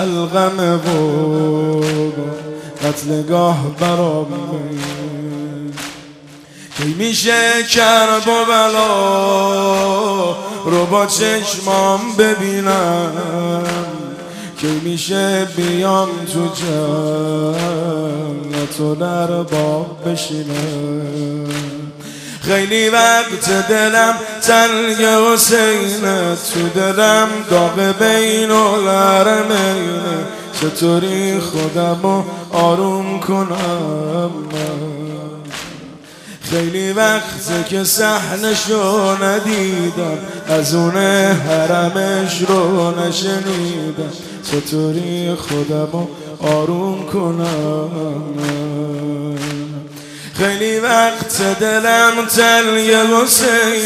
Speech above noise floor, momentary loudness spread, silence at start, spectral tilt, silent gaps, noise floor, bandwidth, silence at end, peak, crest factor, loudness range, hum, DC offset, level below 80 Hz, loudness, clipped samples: 23 dB; 13 LU; 0 s; -4 dB/octave; none; -38 dBFS; 15.5 kHz; 0 s; 0 dBFS; 16 dB; 8 LU; none; under 0.1%; -54 dBFS; -15 LUFS; under 0.1%